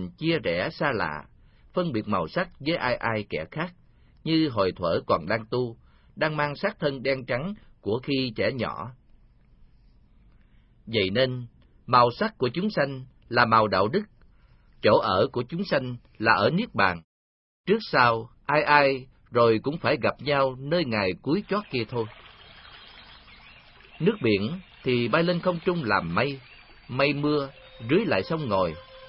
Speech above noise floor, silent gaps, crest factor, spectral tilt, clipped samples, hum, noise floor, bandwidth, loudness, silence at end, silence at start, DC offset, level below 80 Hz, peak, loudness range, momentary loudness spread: 32 dB; 17.04-17.64 s; 24 dB; -10 dB/octave; under 0.1%; none; -57 dBFS; 5.8 kHz; -25 LUFS; 0 s; 0 s; under 0.1%; -56 dBFS; -4 dBFS; 7 LU; 13 LU